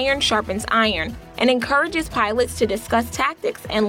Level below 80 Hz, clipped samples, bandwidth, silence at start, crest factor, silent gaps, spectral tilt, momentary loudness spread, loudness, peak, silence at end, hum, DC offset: -42 dBFS; under 0.1%; 17.5 kHz; 0 s; 14 dB; none; -3.5 dB/octave; 5 LU; -20 LUFS; -6 dBFS; 0 s; none; under 0.1%